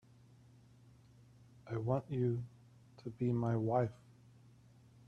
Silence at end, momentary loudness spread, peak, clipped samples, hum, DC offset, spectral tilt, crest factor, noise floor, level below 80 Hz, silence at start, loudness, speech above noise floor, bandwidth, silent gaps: 1.15 s; 17 LU; -20 dBFS; under 0.1%; none; under 0.1%; -10 dB/octave; 20 dB; -63 dBFS; -70 dBFS; 1.65 s; -37 LUFS; 27 dB; 6.6 kHz; none